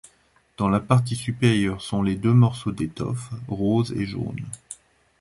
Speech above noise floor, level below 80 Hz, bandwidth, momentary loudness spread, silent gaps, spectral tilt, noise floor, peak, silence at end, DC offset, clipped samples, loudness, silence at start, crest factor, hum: 39 dB; -48 dBFS; 11.5 kHz; 15 LU; none; -7 dB/octave; -61 dBFS; -4 dBFS; 0.45 s; under 0.1%; under 0.1%; -23 LUFS; 0.6 s; 18 dB; none